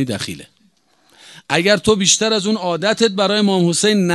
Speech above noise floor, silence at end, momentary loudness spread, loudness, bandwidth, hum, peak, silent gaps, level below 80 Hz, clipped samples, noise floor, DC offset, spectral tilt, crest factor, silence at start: 42 dB; 0 s; 9 LU; -15 LUFS; 12.5 kHz; none; 0 dBFS; none; -50 dBFS; under 0.1%; -58 dBFS; under 0.1%; -3.5 dB/octave; 18 dB; 0 s